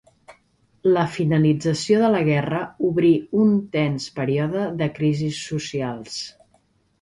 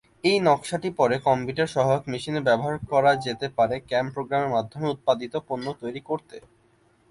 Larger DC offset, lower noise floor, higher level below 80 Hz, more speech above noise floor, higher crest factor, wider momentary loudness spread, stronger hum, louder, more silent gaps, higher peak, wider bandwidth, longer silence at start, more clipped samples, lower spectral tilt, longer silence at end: neither; about the same, -63 dBFS vs -62 dBFS; about the same, -56 dBFS vs -58 dBFS; first, 42 dB vs 38 dB; about the same, 16 dB vs 18 dB; about the same, 9 LU vs 10 LU; neither; first, -21 LUFS vs -25 LUFS; neither; about the same, -6 dBFS vs -6 dBFS; about the same, 11.5 kHz vs 11.5 kHz; about the same, 0.3 s vs 0.25 s; neither; about the same, -6.5 dB/octave vs -5.5 dB/octave; about the same, 0.7 s vs 0.7 s